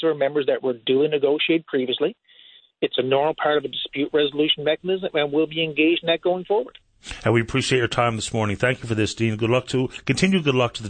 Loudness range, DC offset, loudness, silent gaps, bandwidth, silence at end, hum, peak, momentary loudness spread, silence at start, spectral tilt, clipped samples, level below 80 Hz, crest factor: 1 LU; under 0.1%; -22 LUFS; none; 9.4 kHz; 0 s; none; -6 dBFS; 5 LU; 0 s; -5 dB/octave; under 0.1%; -52 dBFS; 16 dB